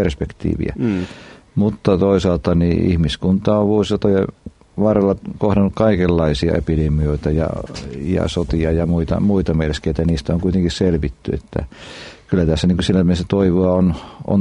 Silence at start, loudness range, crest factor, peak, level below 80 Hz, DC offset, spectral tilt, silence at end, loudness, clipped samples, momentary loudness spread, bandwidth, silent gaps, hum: 0 s; 2 LU; 16 dB; -2 dBFS; -32 dBFS; under 0.1%; -7.5 dB/octave; 0 s; -18 LUFS; under 0.1%; 10 LU; 10.5 kHz; none; none